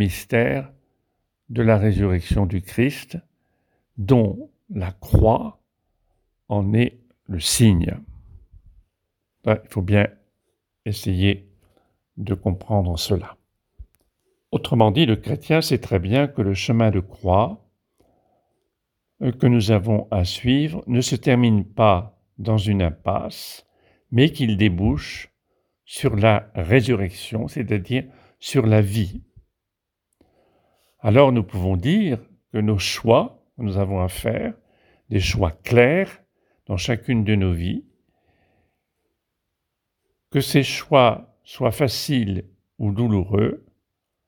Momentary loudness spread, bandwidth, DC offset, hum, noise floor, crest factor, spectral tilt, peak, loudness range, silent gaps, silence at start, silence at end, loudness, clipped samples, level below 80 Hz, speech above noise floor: 13 LU; 19.5 kHz; under 0.1%; none; -82 dBFS; 22 dB; -6 dB/octave; 0 dBFS; 5 LU; none; 0 s; 0.7 s; -21 LUFS; under 0.1%; -40 dBFS; 62 dB